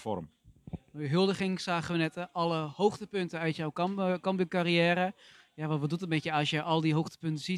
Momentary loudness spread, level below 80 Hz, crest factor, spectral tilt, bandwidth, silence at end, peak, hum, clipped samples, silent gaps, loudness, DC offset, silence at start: 10 LU; -66 dBFS; 18 dB; -6 dB/octave; 12 kHz; 0 s; -12 dBFS; none; under 0.1%; none; -31 LUFS; under 0.1%; 0 s